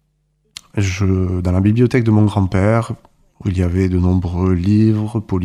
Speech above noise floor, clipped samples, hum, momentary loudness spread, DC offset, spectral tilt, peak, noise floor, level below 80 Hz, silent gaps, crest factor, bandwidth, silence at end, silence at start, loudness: 49 dB; under 0.1%; none; 8 LU; under 0.1%; -8 dB/octave; -2 dBFS; -63 dBFS; -36 dBFS; none; 14 dB; 10.5 kHz; 0 s; 0.75 s; -16 LUFS